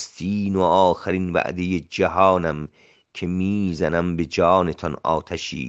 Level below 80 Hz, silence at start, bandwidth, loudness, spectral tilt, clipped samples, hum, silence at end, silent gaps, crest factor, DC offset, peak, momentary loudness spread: -50 dBFS; 0 s; 8 kHz; -21 LUFS; -6.5 dB/octave; under 0.1%; none; 0 s; none; 18 dB; under 0.1%; -2 dBFS; 10 LU